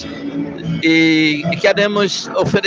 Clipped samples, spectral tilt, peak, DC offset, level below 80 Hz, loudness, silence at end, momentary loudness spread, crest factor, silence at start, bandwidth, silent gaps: under 0.1%; -5 dB/octave; -2 dBFS; under 0.1%; -52 dBFS; -15 LUFS; 0 s; 12 LU; 14 dB; 0 s; 7.6 kHz; none